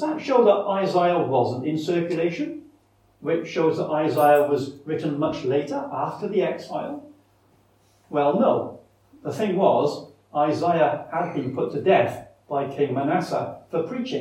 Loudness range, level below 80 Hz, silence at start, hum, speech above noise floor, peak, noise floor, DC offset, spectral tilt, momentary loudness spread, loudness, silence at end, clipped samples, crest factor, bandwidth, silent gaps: 4 LU; -68 dBFS; 0 s; none; 38 dB; -4 dBFS; -60 dBFS; under 0.1%; -7 dB/octave; 11 LU; -23 LUFS; 0 s; under 0.1%; 18 dB; 17 kHz; none